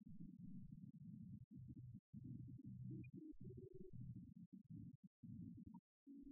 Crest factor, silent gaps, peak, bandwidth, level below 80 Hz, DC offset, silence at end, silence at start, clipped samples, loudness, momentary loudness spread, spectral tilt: 14 dB; 1.44-1.51 s, 1.99-2.13 s, 4.46-4.52 s, 4.95-5.23 s, 5.79-6.06 s; -44 dBFS; 0.7 kHz; -74 dBFS; under 0.1%; 0 s; 0 s; under 0.1%; -59 LUFS; 7 LU; -10 dB/octave